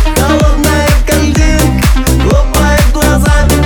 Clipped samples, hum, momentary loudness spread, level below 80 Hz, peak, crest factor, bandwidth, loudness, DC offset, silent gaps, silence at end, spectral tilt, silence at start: under 0.1%; none; 1 LU; -10 dBFS; 0 dBFS; 8 dB; over 20 kHz; -9 LUFS; under 0.1%; none; 0 s; -5 dB/octave; 0 s